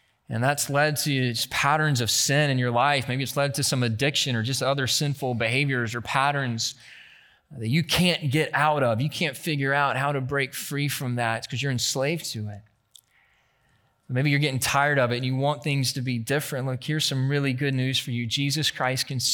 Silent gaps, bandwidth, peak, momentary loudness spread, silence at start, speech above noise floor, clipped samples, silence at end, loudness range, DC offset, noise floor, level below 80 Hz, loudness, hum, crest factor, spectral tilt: none; 19 kHz; -6 dBFS; 6 LU; 0.3 s; 41 dB; under 0.1%; 0 s; 5 LU; under 0.1%; -66 dBFS; -60 dBFS; -24 LUFS; none; 20 dB; -4 dB/octave